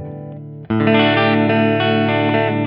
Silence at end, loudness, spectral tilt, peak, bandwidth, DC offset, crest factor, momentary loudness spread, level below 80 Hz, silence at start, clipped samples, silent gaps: 0 s; -15 LUFS; -10.5 dB/octave; 0 dBFS; 5.4 kHz; under 0.1%; 16 dB; 18 LU; -54 dBFS; 0 s; under 0.1%; none